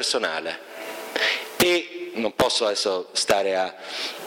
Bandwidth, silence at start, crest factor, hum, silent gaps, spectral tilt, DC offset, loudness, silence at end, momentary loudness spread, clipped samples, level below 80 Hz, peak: 17 kHz; 0 s; 18 dB; none; none; -2 dB/octave; under 0.1%; -23 LUFS; 0 s; 12 LU; under 0.1%; -56 dBFS; -6 dBFS